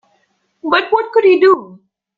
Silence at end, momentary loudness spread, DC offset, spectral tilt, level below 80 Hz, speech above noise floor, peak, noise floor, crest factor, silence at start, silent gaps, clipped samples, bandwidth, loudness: 0.5 s; 7 LU; under 0.1%; -5.5 dB/octave; -62 dBFS; 50 dB; -2 dBFS; -62 dBFS; 14 dB; 0.65 s; none; under 0.1%; 5 kHz; -13 LUFS